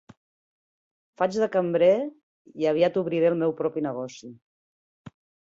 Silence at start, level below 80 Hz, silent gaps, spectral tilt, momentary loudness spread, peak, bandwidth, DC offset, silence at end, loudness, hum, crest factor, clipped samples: 1.2 s; -70 dBFS; 2.23-2.45 s, 4.42-5.05 s; -6.5 dB/octave; 14 LU; -10 dBFS; 7.6 kHz; under 0.1%; 0.5 s; -24 LUFS; none; 18 dB; under 0.1%